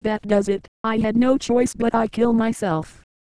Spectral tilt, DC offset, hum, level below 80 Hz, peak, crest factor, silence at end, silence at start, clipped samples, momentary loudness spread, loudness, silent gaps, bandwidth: -6 dB/octave; 0.9%; none; -46 dBFS; -6 dBFS; 14 dB; 0.35 s; 0 s; under 0.1%; 7 LU; -21 LUFS; 0.68-0.84 s; 11 kHz